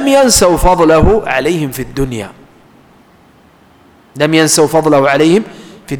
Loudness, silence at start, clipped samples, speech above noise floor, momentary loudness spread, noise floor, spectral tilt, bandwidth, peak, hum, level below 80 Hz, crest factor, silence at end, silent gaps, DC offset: -10 LUFS; 0 s; under 0.1%; 35 dB; 11 LU; -45 dBFS; -4 dB/octave; over 20 kHz; 0 dBFS; none; -26 dBFS; 12 dB; 0 s; none; under 0.1%